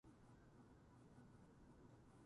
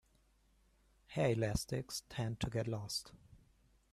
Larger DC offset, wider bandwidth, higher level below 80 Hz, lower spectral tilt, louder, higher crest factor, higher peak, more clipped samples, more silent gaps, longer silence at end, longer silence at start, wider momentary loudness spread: neither; second, 11 kHz vs 14 kHz; second, -76 dBFS vs -58 dBFS; first, -7 dB/octave vs -5 dB/octave; second, -68 LUFS vs -39 LUFS; second, 14 dB vs 20 dB; second, -52 dBFS vs -20 dBFS; neither; neither; second, 0 s vs 0.55 s; second, 0.05 s vs 1.1 s; second, 1 LU vs 9 LU